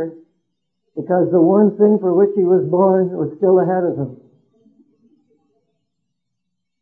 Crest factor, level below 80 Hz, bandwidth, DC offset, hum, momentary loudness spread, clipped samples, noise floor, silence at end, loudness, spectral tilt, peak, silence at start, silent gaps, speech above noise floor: 16 dB; -70 dBFS; 2 kHz; under 0.1%; none; 14 LU; under 0.1%; -78 dBFS; 2.65 s; -15 LUFS; -13.5 dB/octave; -2 dBFS; 0 s; none; 63 dB